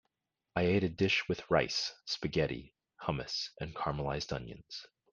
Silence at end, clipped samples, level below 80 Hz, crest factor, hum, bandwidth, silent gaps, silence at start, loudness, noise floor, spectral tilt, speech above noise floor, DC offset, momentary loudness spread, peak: 0.25 s; under 0.1%; -56 dBFS; 22 dB; none; 9.8 kHz; none; 0.55 s; -34 LUFS; -85 dBFS; -5 dB/octave; 50 dB; under 0.1%; 13 LU; -12 dBFS